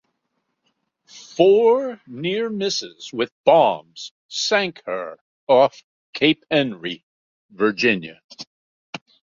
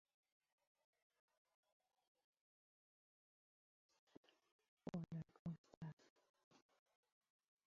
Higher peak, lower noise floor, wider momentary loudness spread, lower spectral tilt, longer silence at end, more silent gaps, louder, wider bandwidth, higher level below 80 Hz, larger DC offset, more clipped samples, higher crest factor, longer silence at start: first, -2 dBFS vs -36 dBFS; second, -74 dBFS vs under -90 dBFS; first, 22 LU vs 8 LU; second, -4 dB/octave vs -8.5 dB/octave; second, 0.4 s vs 1.15 s; first, 3.32-3.44 s, 4.11-4.29 s, 5.21-5.47 s, 5.84-6.13 s, 7.03-7.49 s, 8.24-8.29 s, 8.47-8.93 s vs 5.39-5.45 s, 5.58-5.64 s, 5.77-5.81 s, 5.93-5.97 s, 6.10-6.16 s, 6.29-6.34 s, 6.44-6.51 s; first, -20 LUFS vs -55 LUFS; about the same, 7.6 kHz vs 7.2 kHz; first, -68 dBFS vs -86 dBFS; neither; neither; second, 20 dB vs 26 dB; second, 1.15 s vs 4.85 s